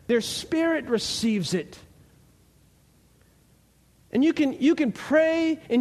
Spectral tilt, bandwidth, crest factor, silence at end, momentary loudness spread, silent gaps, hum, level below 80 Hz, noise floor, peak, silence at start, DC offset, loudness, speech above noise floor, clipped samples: -4.5 dB/octave; 13.5 kHz; 16 dB; 0 s; 7 LU; none; none; -60 dBFS; -60 dBFS; -10 dBFS; 0.1 s; under 0.1%; -24 LUFS; 36 dB; under 0.1%